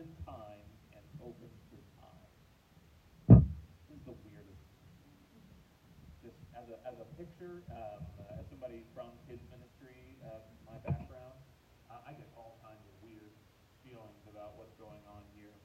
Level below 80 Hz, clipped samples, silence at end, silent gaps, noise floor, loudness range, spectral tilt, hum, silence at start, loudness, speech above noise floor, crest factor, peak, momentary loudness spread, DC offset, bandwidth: -48 dBFS; under 0.1%; 4.65 s; none; -65 dBFS; 24 LU; -10.5 dB/octave; none; 0.2 s; -29 LUFS; 15 dB; 32 dB; -6 dBFS; 17 LU; under 0.1%; 4.7 kHz